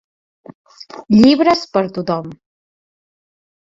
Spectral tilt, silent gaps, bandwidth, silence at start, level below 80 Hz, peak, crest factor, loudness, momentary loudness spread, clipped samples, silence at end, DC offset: -6.5 dB/octave; 0.55-0.65 s; 7.6 kHz; 0.5 s; -52 dBFS; 0 dBFS; 16 dB; -14 LUFS; 24 LU; under 0.1%; 1.25 s; under 0.1%